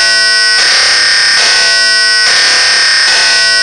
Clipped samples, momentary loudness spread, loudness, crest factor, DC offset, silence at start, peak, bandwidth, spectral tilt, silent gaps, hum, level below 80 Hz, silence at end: 0.2%; 0 LU; -5 LUFS; 8 dB; 0.5%; 0 s; 0 dBFS; 12 kHz; 2.5 dB/octave; none; none; -46 dBFS; 0 s